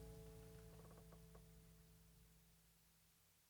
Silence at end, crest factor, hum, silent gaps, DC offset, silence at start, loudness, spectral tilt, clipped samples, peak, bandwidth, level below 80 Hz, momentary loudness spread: 0 s; 16 dB; none; none; under 0.1%; 0 s; -64 LUFS; -5.5 dB/octave; under 0.1%; -48 dBFS; over 20 kHz; -70 dBFS; 8 LU